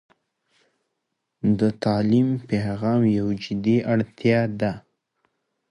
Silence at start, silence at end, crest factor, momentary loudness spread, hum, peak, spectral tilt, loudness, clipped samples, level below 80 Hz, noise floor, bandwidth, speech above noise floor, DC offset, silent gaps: 1.45 s; 0.9 s; 16 dB; 7 LU; none; -8 dBFS; -8.5 dB/octave; -22 LUFS; under 0.1%; -54 dBFS; -79 dBFS; 10.5 kHz; 57 dB; under 0.1%; none